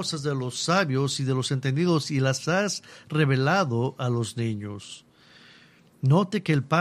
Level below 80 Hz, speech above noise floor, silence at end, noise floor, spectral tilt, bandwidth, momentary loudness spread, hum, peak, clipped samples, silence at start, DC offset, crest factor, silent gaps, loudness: -64 dBFS; 30 dB; 0 s; -55 dBFS; -5.5 dB/octave; 13.5 kHz; 9 LU; none; -8 dBFS; under 0.1%; 0 s; under 0.1%; 18 dB; none; -25 LUFS